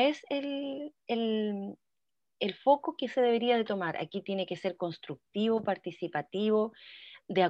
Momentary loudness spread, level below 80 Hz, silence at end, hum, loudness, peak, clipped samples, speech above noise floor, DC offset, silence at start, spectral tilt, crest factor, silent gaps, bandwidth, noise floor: 12 LU; -80 dBFS; 0 s; none; -32 LUFS; -12 dBFS; under 0.1%; over 59 dB; under 0.1%; 0 s; -6.5 dB/octave; 20 dB; none; 8 kHz; under -90 dBFS